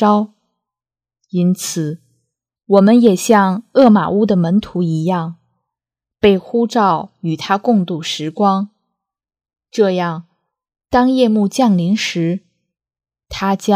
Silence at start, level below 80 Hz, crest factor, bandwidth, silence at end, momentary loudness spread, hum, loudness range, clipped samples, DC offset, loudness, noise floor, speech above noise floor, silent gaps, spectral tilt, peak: 0 s; -50 dBFS; 16 dB; 15.5 kHz; 0 s; 13 LU; none; 5 LU; under 0.1%; under 0.1%; -15 LUFS; -89 dBFS; 76 dB; none; -6 dB/octave; 0 dBFS